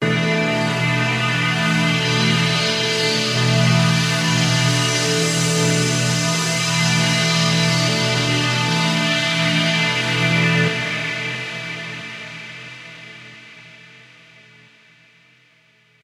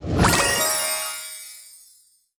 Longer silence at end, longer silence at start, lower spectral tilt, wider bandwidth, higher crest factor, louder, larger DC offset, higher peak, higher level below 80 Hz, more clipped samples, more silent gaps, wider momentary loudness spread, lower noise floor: first, 2.3 s vs 0.6 s; about the same, 0 s vs 0 s; about the same, -4 dB/octave vs -3 dB/octave; second, 15.5 kHz vs over 20 kHz; about the same, 16 dB vs 18 dB; first, -17 LUFS vs -20 LUFS; neither; about the same, -4 dBFS vs -6 dBFS; second, -54 dBFS vs -38 dBFS; neither; neither; second, 14 LU vs 20 LU; about the same, -56 dBFS vs -57 dBFS